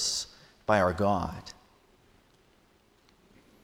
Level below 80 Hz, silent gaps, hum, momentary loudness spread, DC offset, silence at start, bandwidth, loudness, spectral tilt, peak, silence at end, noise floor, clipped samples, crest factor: -56 dBFS; none; none; 18 LU; under 0.1%; 0 s; 18.5 kHz; -29 LUFS; -3.5 dB/octave; -10 dBFS; 2.1 s; -64 dBFS; under 0.1%; 24 dB